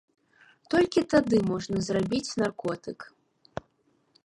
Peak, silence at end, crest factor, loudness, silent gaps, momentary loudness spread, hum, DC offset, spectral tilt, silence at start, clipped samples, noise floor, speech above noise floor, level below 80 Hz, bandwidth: -10 dBFS; 1.2 s; 18 dB; -27 LUFS; none; 19 LU; none; under 0.1%; -5.5 dB/octave; 0.7 s; under 0.1%; -69 dBFS; 43 dB; -58 dBFS; 11.5 kHz